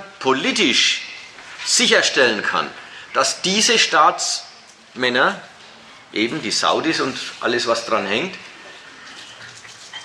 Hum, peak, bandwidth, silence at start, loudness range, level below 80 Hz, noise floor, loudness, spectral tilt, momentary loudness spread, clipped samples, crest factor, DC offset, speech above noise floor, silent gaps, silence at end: none; -2 dBFS; 15 kHz; 0 s; 5 LU; -66 dBFS; -44 dBFS; -17 LUFS; -1.5 dB/octave; 23 LU; under 0.1%; 18 dB; under 0.1%; 26 dB; none; 0 s